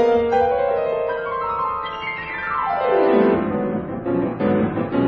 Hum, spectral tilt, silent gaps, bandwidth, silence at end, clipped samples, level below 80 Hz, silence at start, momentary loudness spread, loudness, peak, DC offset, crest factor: none; -8.5 dB/octave; none; 6 kHz; 0 s; under 0.1%; -48 dBFS; 0 s; 9 LU; -20 LUFS; -4 dBFS; under 0.1%; 16 dB